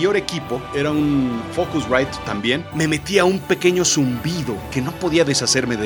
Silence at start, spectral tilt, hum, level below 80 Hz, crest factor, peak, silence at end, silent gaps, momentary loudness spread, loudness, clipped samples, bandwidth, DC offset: 0 s; -4 dB/octave; none; -44 dBFS; 18 dB; -2 dBFS; 0 s; none; 8 LU; -19 LUFS; under 0.1%; 19 kHz; under 0.1%